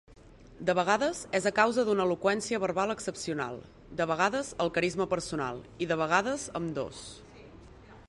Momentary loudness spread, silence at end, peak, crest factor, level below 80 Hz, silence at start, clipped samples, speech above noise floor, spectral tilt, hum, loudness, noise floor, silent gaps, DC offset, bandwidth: 11 LU; 0.05 s; -10 dBFS; 20 dB; -58 dBFS; 0.1 s; under 0.1%; 22 dB; -4.5 dB/octave; none; -30 LUFS; -51 dBFS; none; under 0.1%; 11.5 kHz